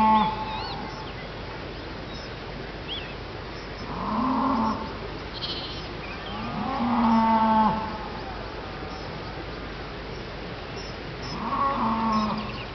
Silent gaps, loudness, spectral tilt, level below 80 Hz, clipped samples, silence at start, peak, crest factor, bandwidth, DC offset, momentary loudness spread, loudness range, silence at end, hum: none; -28 LUFS; -4 dB/octave; -44 dBFS; under 0.1%; 0 s; -10 dBFS; 18 dB; 6.2 kHz; under 0.1%; 15 LU; 10 LU; 0 s; none